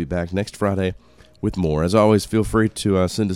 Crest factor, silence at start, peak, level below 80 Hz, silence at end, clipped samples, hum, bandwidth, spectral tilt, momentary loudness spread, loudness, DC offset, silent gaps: 18 dB; 0 s; 0 dBFS; -38 dBFS; 0 s; under 0.1%; none; 16 kHz; -6.5 dB/octave; 10 LU; -20 LUFS; 0.2%; none